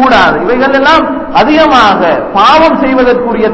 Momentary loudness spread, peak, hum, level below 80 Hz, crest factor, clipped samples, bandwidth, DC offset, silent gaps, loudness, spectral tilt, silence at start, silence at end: 5 LU; 0 dBFS; none; -32 dBFS; 6 dB; 2%; 8 kHz; under 0.1%; none; -6 LUFS; -5 dB/octave; 0 s; 0 s